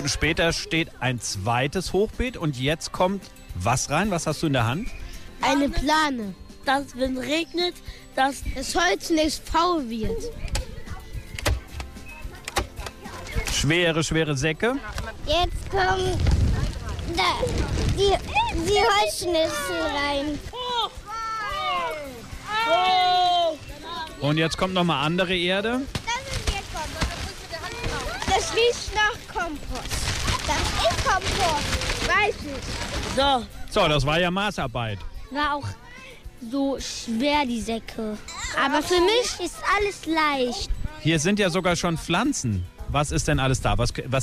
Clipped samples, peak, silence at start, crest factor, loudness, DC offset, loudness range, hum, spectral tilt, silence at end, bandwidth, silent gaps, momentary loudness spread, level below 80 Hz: under 0.1%; -10 dBFS; 0 s; 14 dB; -24 LUFS; under 0.1%; 4 LU; none; -4 dB/octave; 0 s; 15.5 kHz; none; 12 LU; -36 dBFS